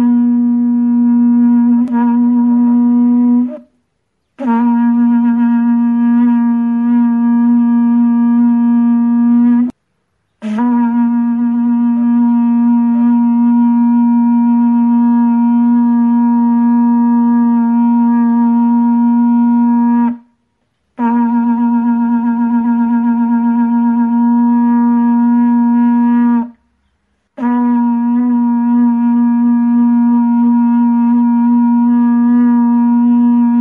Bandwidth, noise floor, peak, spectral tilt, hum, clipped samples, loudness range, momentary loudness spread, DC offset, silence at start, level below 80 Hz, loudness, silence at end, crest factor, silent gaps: 2.8 kHz; -66 dBFS; -4 dBFS; -10 dB/octave; none; under 0.1%; 3 LU; 3 LU; under 0.1%; 0 s; -64 dBFS; -11 LUFS; 0 s; 6 dB; none